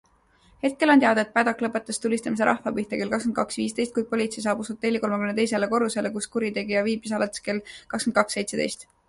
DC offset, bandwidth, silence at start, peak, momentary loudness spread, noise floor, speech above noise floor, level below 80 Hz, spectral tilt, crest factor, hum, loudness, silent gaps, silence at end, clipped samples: under 0.1%; 11.5 kHz; 0.65 s; -6 dBFS; 7 LU; -60 dBFS; 35 dB; -62 dBFS; -4 dB/octave; 20 dB; none; -25 LUFS; none; 0.25 s; under 0.1%